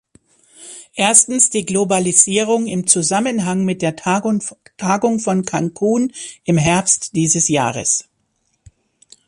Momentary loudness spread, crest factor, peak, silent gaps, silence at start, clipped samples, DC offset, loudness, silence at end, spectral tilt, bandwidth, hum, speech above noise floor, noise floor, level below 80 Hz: 10 LU; 18 dB; 0 dBFS; none; 0.6 s; under 0.1%; under 0.1%; -15 LUFS; 1.25 s; -3.5 dB/octave; 13 kHz; none; 50 dB; -66 dBFS; -54 dBFS